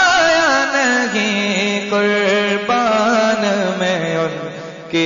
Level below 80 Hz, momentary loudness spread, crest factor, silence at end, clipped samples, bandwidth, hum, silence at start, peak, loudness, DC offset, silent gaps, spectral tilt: -54 dBFS; 8 LU; 12 dB; 0 s; under 0.1%; 7.4 kHz; none; 0 s; -4 dBFS; -15 LUFS; under 0.1%; none; -3.5 dB/octave